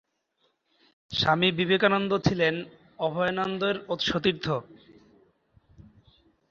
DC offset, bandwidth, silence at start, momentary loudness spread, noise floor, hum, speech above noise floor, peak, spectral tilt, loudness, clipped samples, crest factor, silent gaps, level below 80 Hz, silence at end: under 0.1%; 7.4 kHz; 1.1 s; 10 LU; -73 dBFS; none; 47 dB; -6 dBFS; -5.5 dB/octave; -26 LUFS; under 0.1%; 22 dB; none; -56 dBFS; 1.75 s